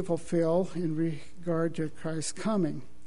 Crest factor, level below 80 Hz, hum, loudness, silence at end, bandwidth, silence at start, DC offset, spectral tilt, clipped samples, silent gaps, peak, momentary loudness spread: 16 dB; -60 dBFS; none; -31 LUFS; 0.2 s; 11 kHz; 0 s; 2%; -6.5 dB/octave; under 0.1%; none; -16 dBFS; 7 LU